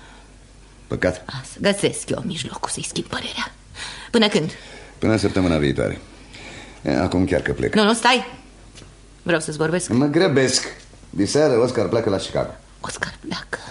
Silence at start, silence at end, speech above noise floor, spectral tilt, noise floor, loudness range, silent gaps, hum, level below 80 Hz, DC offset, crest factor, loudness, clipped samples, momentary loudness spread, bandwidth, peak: 0 s; 0 s; 25 dB; -4.5 dB/octave; -46 dBFS; 5 LU; none; none; -44 dBFS; under 0.1%; 22 dB; -21 LUFS; under 0.1%; 16 LU; 11.5 kHz; 0 dBFS